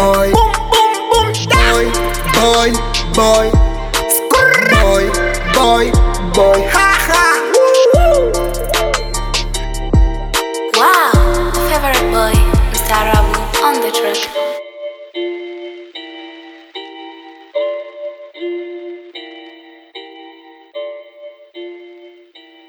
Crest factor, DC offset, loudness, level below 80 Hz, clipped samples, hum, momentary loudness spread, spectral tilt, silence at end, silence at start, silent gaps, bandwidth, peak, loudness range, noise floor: 14 dB; under 0.1%; -12 LUFS; -20 dBFS; under 0.1%; none; 21 LU; -4 dB/octave; 0.6 s; 0 s; none; 20 kHz; 0 dBFS; 17 LU; -42 dBFS